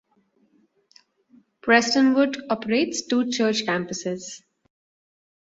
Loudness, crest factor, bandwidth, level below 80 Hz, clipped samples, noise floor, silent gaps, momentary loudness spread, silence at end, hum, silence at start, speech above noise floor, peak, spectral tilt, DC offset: -22 LUFS; 22 dB; 8 kHz; -68 dBFS; under 0.1%; -65 dBFS; none; 14 LU; 1.2 s; none; 1.65 s; 43 dB; -4 dBFS; -3.5 dB/octave; under 0.1%